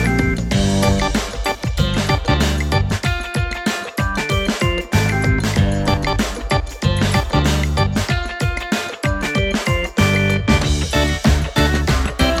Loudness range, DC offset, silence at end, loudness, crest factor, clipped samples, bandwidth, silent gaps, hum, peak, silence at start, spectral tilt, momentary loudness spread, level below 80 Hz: 2 LU; under 0.1%; 0 s; -18 LUFS; 16 dB; under 0.1%; 16.5 kHz; none; none; 0 dBFS; 0 s; -5 dB/octave; 5 LU; -24 dBFS